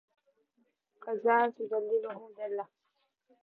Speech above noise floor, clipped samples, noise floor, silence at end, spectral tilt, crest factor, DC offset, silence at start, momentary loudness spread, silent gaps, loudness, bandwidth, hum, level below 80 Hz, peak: 48 dB; under 0.1%; -79 dBFS; 0.8 s; -7.5 dB/octave; 20 dB; under 0.1%; 1 s; 16 LU; none; -32 LUFS; 4.2 kHz; none; under -90 dBFS; -14 dBFS